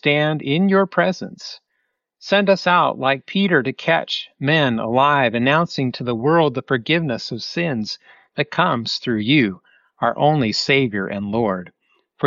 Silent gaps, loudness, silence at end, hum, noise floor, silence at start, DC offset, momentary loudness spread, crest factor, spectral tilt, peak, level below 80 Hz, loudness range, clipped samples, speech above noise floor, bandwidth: none; -19 LUFS; 0 s; none; -72 dBFS; 0.05 s; under 0.1%; 9 LU; 16 dB; -3.5 dB/octave; -2 dBFS; -60 dBFS; 3 LU; under 0.1%; 54 dB; 7.6 kHz